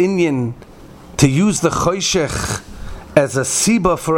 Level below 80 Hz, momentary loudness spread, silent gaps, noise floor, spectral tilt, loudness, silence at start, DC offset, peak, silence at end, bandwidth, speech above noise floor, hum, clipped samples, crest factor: -36 dBFS; 14 LU; none; -39 dBFS; -4.5 dB/octave; -16 LUFS; 0 s; under 0.1%; 0 dBFS; 0 s; 18 kHz; 23 dB; none; under 0.1%; 16 dB